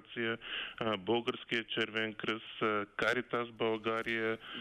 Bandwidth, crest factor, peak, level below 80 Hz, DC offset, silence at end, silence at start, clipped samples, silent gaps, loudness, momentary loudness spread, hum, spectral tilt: 13.5 kHz; 16 dB; -18 dBFS; -70 dBFS; under 0.1%; 0 s; 0 s; under 0.1%; none; -35 LUFS; 5 LU; none; -5 dB/octave